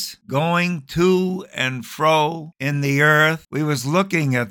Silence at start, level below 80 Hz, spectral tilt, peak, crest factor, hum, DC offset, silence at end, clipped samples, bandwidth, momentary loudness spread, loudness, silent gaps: 0 s; -54 dBFS; -5.5 dB/octave; -2 dBFS; 16 dB; none; under 0.1%; 0 s; under 0.1%; 19 kHz; 9 LU; -19 LUFS; none